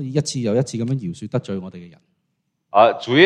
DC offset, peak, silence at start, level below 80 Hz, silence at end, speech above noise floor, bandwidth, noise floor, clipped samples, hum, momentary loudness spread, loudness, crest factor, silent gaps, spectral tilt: under 0.1%; 0 dBFS; 0 s; -62 dBFS; 0 s; 54 dB; 11 kHz; -73 dBFS; under 0.1%; none; 15 LU; -20 LUFS; 20 dB; none; -5.5 dB/octave